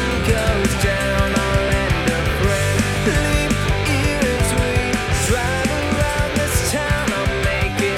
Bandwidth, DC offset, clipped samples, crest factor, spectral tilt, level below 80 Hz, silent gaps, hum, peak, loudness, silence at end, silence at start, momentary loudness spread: 17 kHz; under 0.1%; under 0.1%; 14 dB; -4.5 dB/octave; -26 dBFS; none; none; -4 dBFS; -18 LUFS; 0 s; 0 s; 2 LU